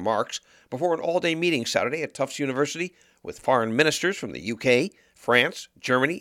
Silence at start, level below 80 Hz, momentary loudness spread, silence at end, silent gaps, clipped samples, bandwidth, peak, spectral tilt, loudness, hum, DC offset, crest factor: 0 s; -66 dBFS; 13 LU; 0 s; none; under 0.1%; 16.5 kHz; -4 dBFS; -4 dB/octave; -25 LUFS; none; under 0.1%; 22 dB